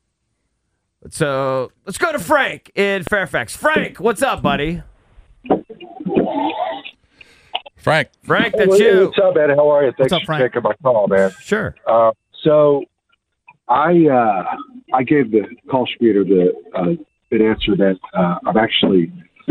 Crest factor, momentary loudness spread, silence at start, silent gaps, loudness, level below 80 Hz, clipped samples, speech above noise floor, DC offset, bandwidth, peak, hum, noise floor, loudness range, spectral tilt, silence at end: 14 dB; 11 LU; 1.05 s; none; -16 LUFS; -46 dBFS; under 0.1%; 55 dB; under 0.1%; 15.5 kHz; -2 dBFS; none; -71 dBFS; 6 LU; -5.5 dB/octave; 0 s